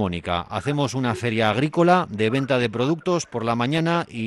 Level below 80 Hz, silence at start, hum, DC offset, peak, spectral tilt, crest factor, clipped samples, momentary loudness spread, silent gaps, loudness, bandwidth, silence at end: -56 dBFS; 0 s; none; under 0.1%; -6 dBFS; -6 dB/octave; 16 dB; under 0.1%; 7 LU; none; -22 LUFS; 12 kHz; 0 s